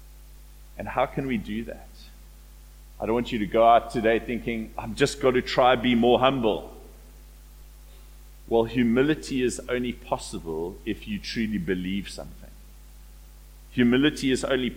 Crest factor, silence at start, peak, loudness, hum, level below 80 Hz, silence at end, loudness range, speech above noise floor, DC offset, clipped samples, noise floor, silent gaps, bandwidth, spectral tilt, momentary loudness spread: 20 dB; 0 s; -6 dBFS; -25 LUFS; none; -44 dBFS; 0 s; 9 LU; 22 dB; under 0.1%; under 0.1%; -47 dBFS; none; 16.5 kHz; -5.5 dB/octave; 14 LU